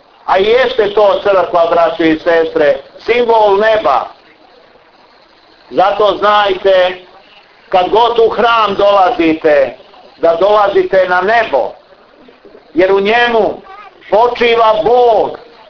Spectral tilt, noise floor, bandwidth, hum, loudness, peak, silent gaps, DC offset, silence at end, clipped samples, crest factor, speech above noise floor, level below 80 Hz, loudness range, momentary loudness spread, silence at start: -5.5 dB/octave; -44 dBFS; 5.4 kHz; none; -11 LUFS; 0 dBFS; none; under 0.1%; 0.3 s; under 0.1%; 12 dB; 34 dB; -46 dBFS; 3 LU; 7 LU; 0.25 s